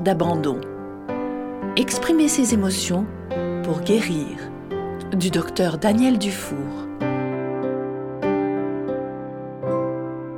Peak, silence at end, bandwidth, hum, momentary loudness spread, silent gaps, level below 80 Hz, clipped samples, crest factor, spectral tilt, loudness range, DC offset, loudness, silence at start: -4 dBFS; 0 s; 18 kHz; none; 12 LU; none; -52 dBFS; under 0.1%; 18 dB; -5 dB/octave; 4 LU; under 0.1%; -23 LUFS; 0 s